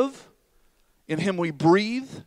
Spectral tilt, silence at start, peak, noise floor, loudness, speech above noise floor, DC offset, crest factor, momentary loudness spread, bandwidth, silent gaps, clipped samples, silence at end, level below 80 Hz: -6.5 dB/octave; 0 s; -8 dBFS; -63 dBFS; -24 LUFS; 39 dB; under 0.1%; 18 dB; 9 LU; 11 kHz; none; under 0.1%; 0.05 s; -66 dBFS